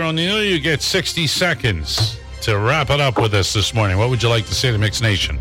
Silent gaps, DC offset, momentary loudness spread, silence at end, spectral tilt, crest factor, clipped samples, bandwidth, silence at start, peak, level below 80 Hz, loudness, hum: none; under 0.1%; 3 LU; 0 s; -4 dB/octave; 12 dB; under 0.1%; 16.5 kHz; 0 s; -6 dBFS; -34 dBFS; -17 LUFS; none